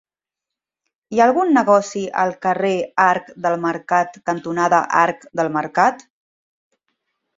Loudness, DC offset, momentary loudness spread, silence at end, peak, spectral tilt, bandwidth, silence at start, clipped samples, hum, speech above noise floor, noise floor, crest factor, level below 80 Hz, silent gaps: -18 LUFS; under 0.1%; 8 LU; 1.4 s; -2 dBFS; -5.5 dB/octave; 7.8 kHz; 1.1 s; under 0.1%; none; 69 dB; -86 dBFS; 18 dB; -66 dBFS; none